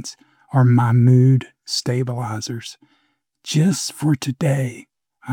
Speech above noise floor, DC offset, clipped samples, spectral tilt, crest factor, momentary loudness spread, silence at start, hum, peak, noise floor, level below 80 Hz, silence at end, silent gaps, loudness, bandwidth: 46 dB; under 0.1%; under 0.1%; -6 dB/octave; 14 dB; 15 LU; 0 s; none; -4 dBFS; -64 dBFS; -64 dBFS; 0 s; none; -19 LUFS; 13.5 kHz